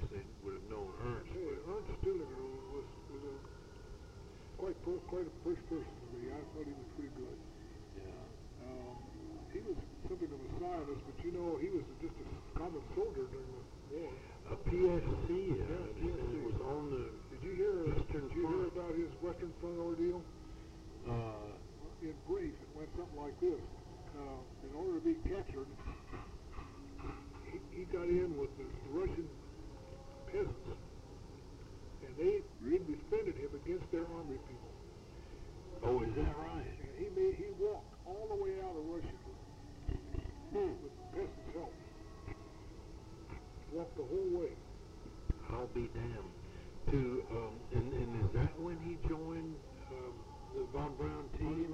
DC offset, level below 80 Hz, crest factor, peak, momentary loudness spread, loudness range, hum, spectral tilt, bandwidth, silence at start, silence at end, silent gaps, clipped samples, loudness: under 0.1%; -50 dBFS; 20 dB; -20 dBFS; 16 LU; 7 LU; none; -8 dB/octave; 10.5 kHz; 0 s; 0 s; none; under 0.1%; -42 LUFS